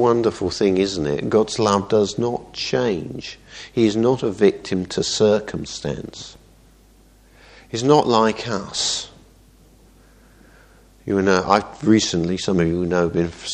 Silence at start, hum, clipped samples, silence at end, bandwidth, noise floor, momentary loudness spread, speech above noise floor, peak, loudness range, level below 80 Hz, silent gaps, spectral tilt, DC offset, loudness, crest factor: 0 s; none; under 0.1%; 0 s; 10 kHz; -51 dBFS; 13 LU; 32 dB; 0 dBFS; 4 LU; -48 dBFS; none; -5 dB/octave; under 0.1%; -20 LUFS; 20 dB